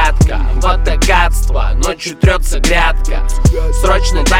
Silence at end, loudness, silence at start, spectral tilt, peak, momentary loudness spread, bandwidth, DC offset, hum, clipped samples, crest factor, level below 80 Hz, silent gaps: 0 s; -14 LUFS; 0 s; -4.5 dB/octave; -2 dBFS; 5 LU; 15 kHz; under 0.1%; none; under 0.1%; 10 dB; -12 dBFS; none